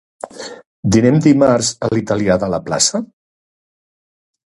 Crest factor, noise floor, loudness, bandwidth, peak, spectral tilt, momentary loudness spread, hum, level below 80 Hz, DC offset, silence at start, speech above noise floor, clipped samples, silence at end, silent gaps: 16 dB; under -90 dBFS; -15 LUFS; 11.5 kHz; 0 dBFS; -5 dB/octave; 20 LU; none; -44 dBFS; under 0.1%; 0.25 s; over 76 dB; under 0.1%; 1.45 s; 0.66-0.83 s